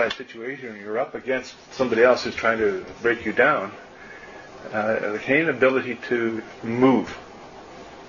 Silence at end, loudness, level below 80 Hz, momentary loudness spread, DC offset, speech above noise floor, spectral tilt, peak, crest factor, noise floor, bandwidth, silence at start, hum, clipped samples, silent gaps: 0 s; -23 LUFS; -58 dBFS; 22 LU; under 0.1%; 19 dB; -5.5 dB/octave; -4 dBFS; 20 dB; -42 dBFS; 7.4 kHz; 0 s; none; under 0.1%; none